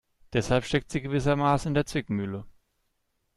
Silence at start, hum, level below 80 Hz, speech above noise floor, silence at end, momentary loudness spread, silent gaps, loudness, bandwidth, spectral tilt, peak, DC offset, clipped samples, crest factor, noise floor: 0.3 s; none; -48 dBFS; 49 dB; 0.85 s; 7 LU; none; -27 LUFS; 12.5 kHz; -6 dB/octave; -10 dBFS; under 0.1%; under 0.1%; 18 dB; -75 dBFS